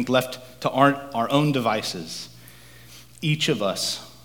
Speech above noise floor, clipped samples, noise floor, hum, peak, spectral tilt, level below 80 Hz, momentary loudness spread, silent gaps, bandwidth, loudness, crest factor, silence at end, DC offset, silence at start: 24 dB; under 0.1%; -47 dBFS; none; -2 dBFS; -4.5 dB/octave; -60 dBFS; 14 LU; none; 19.5 kHz; -23 LUFS; 22 dB; 0.15 s; 0.2%; 0 s